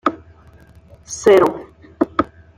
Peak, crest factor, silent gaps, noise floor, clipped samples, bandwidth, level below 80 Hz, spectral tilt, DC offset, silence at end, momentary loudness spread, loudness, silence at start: -2 dBFS; 18 dB; none; -46 dBFS; under 0.1%; 15 kHz; -50 dBFS; -4.5 dB/octave; under 0.1%; 0.35 s; 17 LU; -16 LUFS; 0.05 s